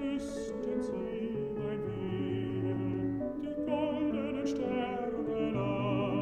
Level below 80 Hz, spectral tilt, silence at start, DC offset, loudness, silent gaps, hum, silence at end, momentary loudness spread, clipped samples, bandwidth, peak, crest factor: -56 dBFS; -7.5 dB/octave; 0 s; under 0.1%; -34 LUFS; none; none; 0 s; 4 LU; under 0.1%; 9.8 kHz; -20 dBFS; 14 dB